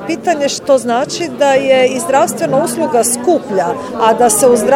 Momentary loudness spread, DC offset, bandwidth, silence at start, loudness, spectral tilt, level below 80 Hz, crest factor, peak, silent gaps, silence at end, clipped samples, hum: 7 LU; under 0.1%; 16.5 kHz; 0 s; -12 LUFS; -3.5 dB/octave; -52 dBFS; 12 dB; 0 dBFS; none; 0 s; under 0.1%; none